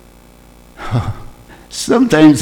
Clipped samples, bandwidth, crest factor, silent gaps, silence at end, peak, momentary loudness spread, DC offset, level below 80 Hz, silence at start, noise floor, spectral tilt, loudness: under 0.1%; 13.5 kHz; 14 dB; none; 0 s; 0 dBFS; 22 LU; under 0.1%; -36 dBFS; 0.8 s; -42 dBFS; -5.5 dB/octave; -14 LUFS